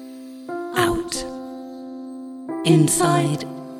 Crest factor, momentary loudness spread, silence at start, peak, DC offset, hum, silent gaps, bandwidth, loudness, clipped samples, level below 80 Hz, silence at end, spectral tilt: 18 dB; 19 LU; 0 s; -4 dBFS; under 0.1%; none; none; 16 kHz; -20 LUFS; under 0.1%; -48 dBFS; 0 s; -5 dB/octave